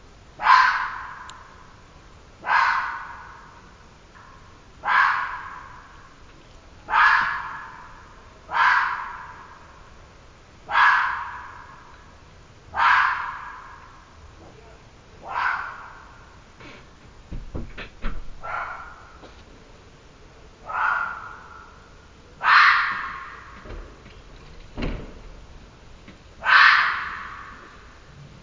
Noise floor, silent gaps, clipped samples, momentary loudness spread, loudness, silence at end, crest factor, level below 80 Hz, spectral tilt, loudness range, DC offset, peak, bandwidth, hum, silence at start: -48 dBFS; none; under 0.1%; 27 LU; -20 LUFS; 0.15 s; 26 dB; -46 dBFS; -2.5 dB/octave; 15 LU; under 0.1%; 0 dBFS; 7.6 kHz; none; 0.4 s